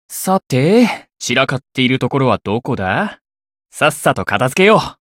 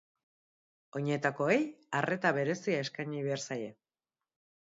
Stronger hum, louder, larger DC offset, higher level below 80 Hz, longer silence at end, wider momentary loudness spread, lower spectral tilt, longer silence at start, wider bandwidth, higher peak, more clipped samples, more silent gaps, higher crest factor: neither; first, -15 LUFS vs -33 LUFS; neither; first, -50 dBFS vs -80 dBFS; second, 0.2 s vs 1 s; about the same, 8 LU vs 9 LU; about the same, -5 dB/octave vs -4.5 dB/octave; second, 0.1 s vs 0.95 s; first, 17 kHz vs 7.6 kHz; first, 0 dBFS vs -14 dBFS; neither; first, 3.21-3.25 s vs none; about the same, 16 dB vs 20 dB